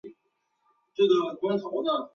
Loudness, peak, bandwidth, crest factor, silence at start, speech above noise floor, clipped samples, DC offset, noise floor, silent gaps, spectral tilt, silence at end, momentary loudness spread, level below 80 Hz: -26 LUFS; -12 dBFS; 6.8 kHz; 16 dB; 0.05 s; 50 dB; under 0.1%; under 0.1%; -75 dBFS; none; -6.5 dB/octave; 0.05 s; 6 LU; -74 dBFS